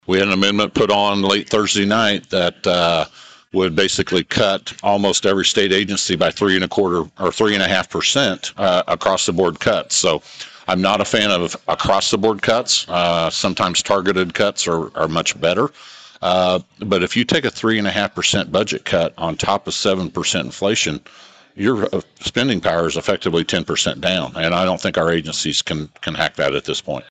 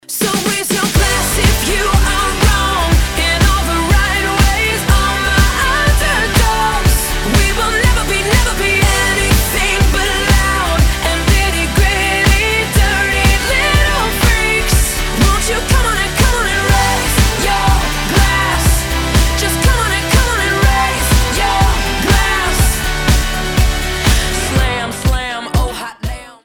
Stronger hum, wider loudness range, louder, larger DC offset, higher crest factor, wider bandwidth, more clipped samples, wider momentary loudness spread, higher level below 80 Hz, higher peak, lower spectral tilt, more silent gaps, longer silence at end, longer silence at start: neither; about the same, 3 LU vs 1 LU; second, -18 LUFS vs -13 LUFS; second, under 0.1% vs 0.1%; about the same, 14 dB vs 12 dB; second, 9.4 kHz vs 19 kHz; neither; about the same, 5 LU vs 3 LU; second, -48 dBFS vs -16 dBFS; about the same, -4 dBFS vs -2 dBFS; about the same, -3.5 dB/octave vs -3.5 dB/octave; neither; about the same, 0.1 s vs 0.15 s; about the same, 0.1 s vs 0.1 s